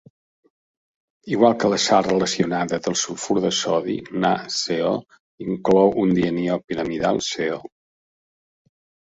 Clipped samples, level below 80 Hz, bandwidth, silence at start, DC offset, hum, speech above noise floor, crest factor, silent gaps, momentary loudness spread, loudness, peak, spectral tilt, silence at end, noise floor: under 0.1%; -56 dBFS; 8.4 kHz; 1.25 s; under 0.1%; none; over 69 dB; 20 dB; 5.20-5.38 s, 6.64-6.68 s; 10 LU; -21 LUFS; -2 dBFS; -4.5 dB/octave; 1.45 s; under -90 dBFS